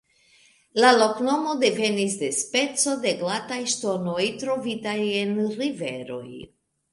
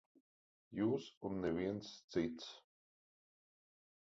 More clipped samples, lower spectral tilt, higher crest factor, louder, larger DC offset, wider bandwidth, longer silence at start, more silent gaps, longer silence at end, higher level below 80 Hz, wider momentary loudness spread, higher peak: neither; second, -3 dB/octave vs -6 dB/octave; about the same, 22 dB vs 20 dB; first, -23 LUFS vs -42 LUFS; neither; first, 11.5 kHz vs 7.6 kHz; about the same, 0.75 s vs 0.7 s; second, none vs 1.17-1.21 s, 2.04-2.08 s; second, 0.45 s vs 1.45 s; about the same, -68 dBFS vs -70 dBFS; about the same, 12 LU vs 12 LU; first, -4 dBFS vs -24 dBFS